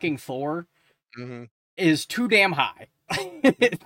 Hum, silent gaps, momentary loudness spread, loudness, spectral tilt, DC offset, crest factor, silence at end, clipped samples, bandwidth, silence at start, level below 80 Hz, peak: none; 1.51-1.77 s; 20 LU; -23 LUFS; -4.5 dB/octave; under 0.1%; 20 dB; 0.1 s; under 0.1%; 17 kHz; 0 s; -64 dBFS; -4 dBFS